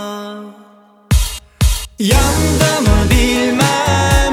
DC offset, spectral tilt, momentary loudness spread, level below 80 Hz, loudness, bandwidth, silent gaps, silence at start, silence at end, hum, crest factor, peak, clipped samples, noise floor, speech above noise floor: under 0.1%; -4.5 dB/octave; 12 LU; -18 dBFS; -14 LUFS; 17.5 kHz; none; 0 s; 0 s; none; 12 dB; 0 dBFS; under 0.1%; -45 dBFS; 33 dB